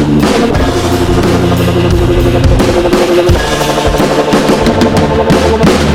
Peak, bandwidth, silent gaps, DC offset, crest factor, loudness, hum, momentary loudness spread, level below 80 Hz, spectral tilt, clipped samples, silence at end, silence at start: 0 dBFS; 16.5 kHz; none; 1%; 8 dB; -9 LUFS; none; 2 LU; -18 dBFS; -6 dB/octave; 0.3%; 0 s; 0 s